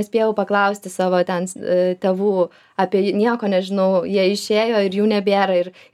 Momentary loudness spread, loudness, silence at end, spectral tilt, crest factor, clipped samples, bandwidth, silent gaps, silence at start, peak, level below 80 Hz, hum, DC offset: 5 LU; -19 LUFS; 0.25 s; -5.5 dB/octave; 14 dB; under 0.1%; 14.5 kHz; none; 0 s; -4 dBFS; -72 dBFS; none; under 0.1%